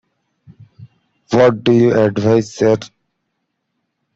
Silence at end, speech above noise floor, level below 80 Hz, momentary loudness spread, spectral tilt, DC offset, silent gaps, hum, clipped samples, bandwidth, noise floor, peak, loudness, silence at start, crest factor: 1.3 s; 59 dB; -54 dBFS; 5 LU; -7 dB/octave; under 0.1%; none; none; under 0.1%; 7.8 kHz; -72 dBFS; -2 dBFS; -14 LUFS; 0.8 s; 16 dB